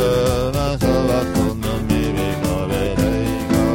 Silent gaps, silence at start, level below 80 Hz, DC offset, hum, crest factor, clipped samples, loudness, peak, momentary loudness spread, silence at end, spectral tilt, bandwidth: none; 0 s; -30 dBFS; under 0.1%; none; 14 dB; under 0.1%; -19 LUFS; -4 dBFS; 3 LU; 0 s; -6 dB/octave; 17.5 kHz